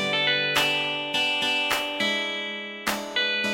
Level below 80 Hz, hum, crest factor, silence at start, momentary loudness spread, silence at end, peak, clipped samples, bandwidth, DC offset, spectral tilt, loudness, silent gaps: -64 dBFS; none; 20 dB; 0 s; 7 LU; 0 s; -6 dBFS; under 0.1%; 17 kHz; under 0.1%; -2 dB/octave; -24 LUFS; none